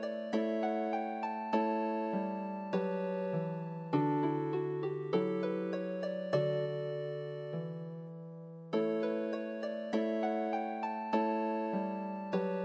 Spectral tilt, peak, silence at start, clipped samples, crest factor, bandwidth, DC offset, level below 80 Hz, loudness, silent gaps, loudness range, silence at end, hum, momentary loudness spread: -8.5 dB/octave; -18 dBFS; 0 s; under 0.1%; 18 dB; 7.8 kHz; under 0.1%; -86 dBFS; -36 LUFS; none; 3 LU; 0 s; none; 8 LU